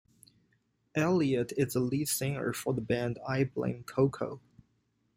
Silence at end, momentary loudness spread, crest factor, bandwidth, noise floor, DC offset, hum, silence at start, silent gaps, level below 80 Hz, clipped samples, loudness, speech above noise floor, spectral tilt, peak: 0.8 s; 8 LU; 18 dB; 16 kHz; -75 dBFS; under 0.1%; none; 0.95 s; none; -64 dBFS; under 0.1%; -31 LUFS; 44 dB; -5.5 dB/octave; -14 dBFS